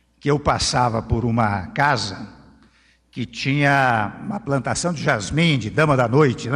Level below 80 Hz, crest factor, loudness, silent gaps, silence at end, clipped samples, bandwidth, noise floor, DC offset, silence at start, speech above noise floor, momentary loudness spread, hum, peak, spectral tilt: -42 dBFS; 16 dB; -20 LUFS; none; 0 s; under 0.1%; 11 kHz; -57 dBFS; under 0.1%; 0.25 s; 37 dB; 12 LU; none; -4 dBFS; -5 dB/octave